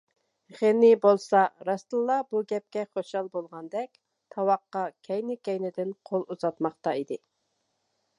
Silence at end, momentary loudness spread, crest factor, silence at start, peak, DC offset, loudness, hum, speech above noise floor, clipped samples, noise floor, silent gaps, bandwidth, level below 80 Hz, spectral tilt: 1.05 s; 15 LU; 20 dB; 0.55 s; -8 dBFS; under 0.1%; -27 LUFS; none; 50 dB; under 0.1%; -77 dBFS; none; 10.5 kHz; -84 dBFS; -6.5 dB/octave